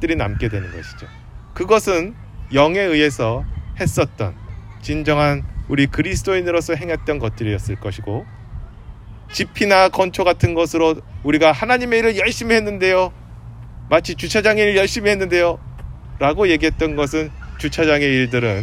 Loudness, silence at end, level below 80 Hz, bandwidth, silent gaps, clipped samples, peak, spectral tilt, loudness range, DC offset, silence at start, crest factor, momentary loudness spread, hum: -18 LUFS; 0 s; -34 dBFS; 16 kHz; none; under 0.1%; 0 dBFS; -5.5 dB/octave; 4 LU; under 0.1%; 0 s; 18 dB; 21 LU; none